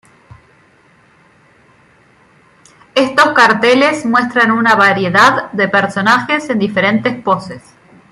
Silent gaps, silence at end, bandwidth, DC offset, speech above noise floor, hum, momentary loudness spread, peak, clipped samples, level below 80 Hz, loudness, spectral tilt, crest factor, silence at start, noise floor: none; 0.5 s; 15 kHz; under 0.1%; 37 dB; none; 8 LU; 0 dBFS; under 0.1%; -56 dBFS; -11 LUFS; -4.5 dB/octave; 14 dB; 2.95 s; -49 dBFS